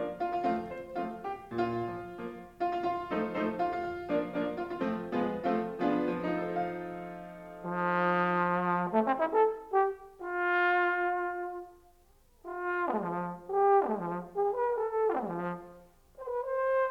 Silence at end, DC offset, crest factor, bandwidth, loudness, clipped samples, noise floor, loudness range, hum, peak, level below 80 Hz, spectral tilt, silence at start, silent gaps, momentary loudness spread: 0 s; under 0.1%; 18 dB; 15 kHz; -32 LUFS; under 0.1%; -62 dBFS; 5 LU; none; -14 dBFS; -64 dBFS; -8 dB/octave; 0 s; none; 13 LU